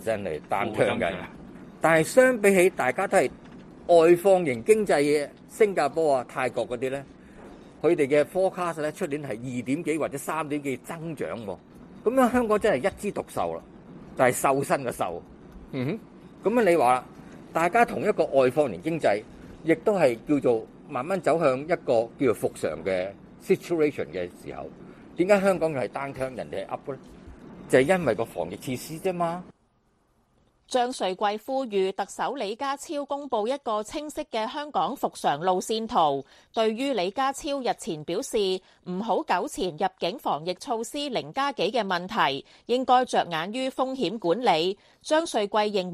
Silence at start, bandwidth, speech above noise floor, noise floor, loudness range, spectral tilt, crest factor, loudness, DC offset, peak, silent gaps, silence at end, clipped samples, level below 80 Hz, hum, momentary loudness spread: 0 s; 14.5 kHz; 42 dB; -67 dBFS; 7 LU; -5 dB/octave; 20 dB; -26 LUFS; under 0.1%; -4 dBFS; none; 0 s; under 0.1%; -58 dBFS; none; 12 LU